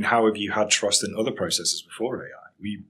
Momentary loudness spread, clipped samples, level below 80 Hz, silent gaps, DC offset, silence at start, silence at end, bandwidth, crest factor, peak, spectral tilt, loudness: 15 LU; under 0.1%; -68 dBFS; none; under 0.1%; 0 s; 0.05 s; 16 kHz; 22 dB; -2 dBFS; -2 dB/octave; -23 LUFS